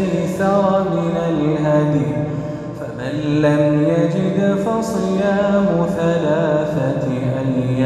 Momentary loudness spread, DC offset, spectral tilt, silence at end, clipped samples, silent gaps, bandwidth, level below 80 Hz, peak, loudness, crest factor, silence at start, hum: 7 LU; under 0.1%; -8 dB/octave; 0 s; under 0.1%; none; 12.5 kHz; -46 dBFS; -2 dBFS; -18 LUFS; 14 dB; 0 s; none